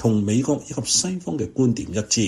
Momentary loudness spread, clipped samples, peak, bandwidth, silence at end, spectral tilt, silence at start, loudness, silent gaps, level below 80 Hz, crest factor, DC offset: 7 LU; under 0.1%; -6 dBFS; 14 kHz; 0 s; -4.5 dB/octave; 0 s; -22 LUFS; none; -50 dBFS; 16 dB; under 0.1%